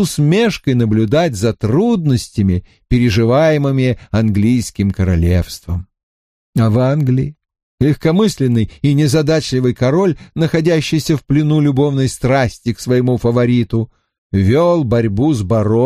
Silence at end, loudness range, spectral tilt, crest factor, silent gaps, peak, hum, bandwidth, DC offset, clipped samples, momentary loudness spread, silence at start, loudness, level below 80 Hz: 0 s; 2 LU; -7 dB/octave; 12 dB; 6.03-6.53 s, 7.63-7.78 s, 14.18-14.30 s; -2 dBFS; none; 15 kHz; under 0.1%; under 0.1%; 6 LU; 0 s; -15 LUFS; -34 dBFS